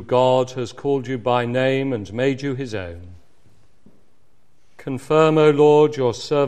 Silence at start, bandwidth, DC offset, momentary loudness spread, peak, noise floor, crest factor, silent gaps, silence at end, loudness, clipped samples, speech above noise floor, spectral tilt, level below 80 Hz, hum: 0 s; 9.6 kHz; 0.7%; 17 LU; -2 dBFS; -63 dBFS; 18 dB; none; 0 s; -19 LUFS; under 0.1%; 45 dB; -6.5 dB/octave; -56 dBFS; none